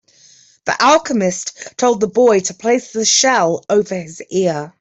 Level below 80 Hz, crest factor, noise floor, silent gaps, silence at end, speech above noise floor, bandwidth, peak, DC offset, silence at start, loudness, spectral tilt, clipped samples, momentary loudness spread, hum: -58 dBFS; 14 dB; -48 dBFS; none; 0.1 s; 33 dB; 8.4 kHz; -2 dBFS; under 0.1%; 0.65 s; -15 LUFS; -3 dB/octave; under 0.1%; 12 LU; none